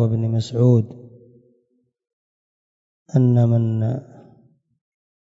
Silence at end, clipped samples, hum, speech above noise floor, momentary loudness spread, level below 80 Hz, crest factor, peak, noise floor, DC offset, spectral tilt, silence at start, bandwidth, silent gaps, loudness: 1.2 s; under 0.1%; none; 50 dB; 9 LU; -60 dBFS; 16 dB; -6 dBFS; -67 dBFS; under 0.1%; -9.5 dB/octave; 0 s; 7.8 kHz; 2.13-3.06 s; -19 LUFS